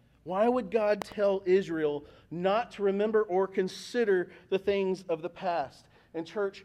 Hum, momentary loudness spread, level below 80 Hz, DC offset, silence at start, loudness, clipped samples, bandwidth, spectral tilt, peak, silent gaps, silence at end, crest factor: none; 9 LU; -66 dBFS; under 0.1%; 0.25 s; -30 LUFS; under 0.1%; 11.5 kHz; -6 dB/octave; -14 dBFS; none; 0 s; 14 dB